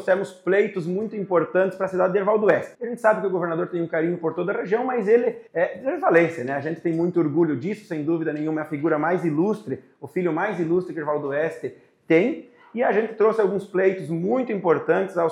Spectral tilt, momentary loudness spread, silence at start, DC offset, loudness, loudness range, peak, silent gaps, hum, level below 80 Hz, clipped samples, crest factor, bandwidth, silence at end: -8 dB/octave; 8 LU; 0 s; under 0.1%; -23 LUFS; 3 LU; -4 dBFS; none; none; -74 dBFS; under 0.1%; 18 dB; 11 kHz; 0 s